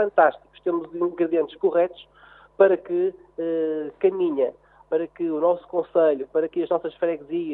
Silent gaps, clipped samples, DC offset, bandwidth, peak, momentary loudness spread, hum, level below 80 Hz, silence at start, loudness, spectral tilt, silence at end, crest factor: none; under 0.1%; under 0.1%; 4 kHz; -4 dBFS; 8 LU; none; -66 dBFS; 0 s; -24 LUFS; -9.5 dB/octave; 0 s; 18 dB